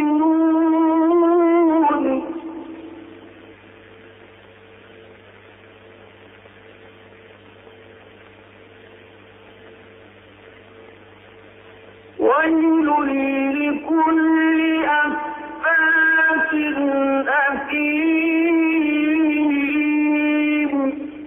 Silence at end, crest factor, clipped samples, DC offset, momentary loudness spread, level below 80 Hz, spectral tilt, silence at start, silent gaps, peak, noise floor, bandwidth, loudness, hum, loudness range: 0 s; 14 dB; under 0.1%; under 0.1%; 8 LU; -60 dBFS; -8 dB/octave; 0 s; none; -6 dBFS; -45 dBFS; 3.7 kHz; -18 LUFS; none; 8 LU